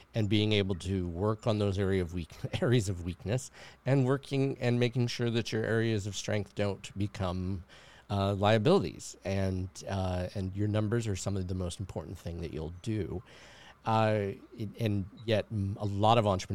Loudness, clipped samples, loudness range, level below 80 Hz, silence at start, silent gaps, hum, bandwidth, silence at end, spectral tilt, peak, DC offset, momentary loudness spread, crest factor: -32 LUFS; under 0.1%; 4 LU; -56 dBFS; 0 s; none; none; 13.5 kHz; 0 s; -6 dB/octave; -10 dBFS; 0.1%; 12 LU; 22 dB